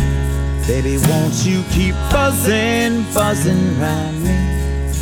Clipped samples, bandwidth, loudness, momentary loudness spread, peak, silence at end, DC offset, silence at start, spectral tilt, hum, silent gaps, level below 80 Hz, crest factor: under 0.1%; 19.5 kHz; -16 LUFS; 4 LU; -2 dBFS; 0 s; under 0.1%; 0 s; -5.5 dB/octave; none; none; -22 dBFS; 14 dB